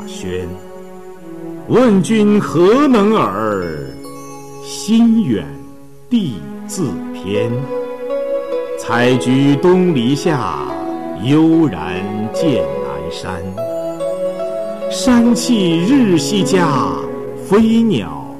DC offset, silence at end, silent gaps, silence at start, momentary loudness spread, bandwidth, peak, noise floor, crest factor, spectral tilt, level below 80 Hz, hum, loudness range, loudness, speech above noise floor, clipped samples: 1%; 0 s; none; 0 s; 17 LU; 14 kHz; -4 dBFS; -38 dBFS; 10 dB; -6 dB/octave; -46 dBFS; none; 5 LU; -15 LUFS; 25 dB; under 0.1%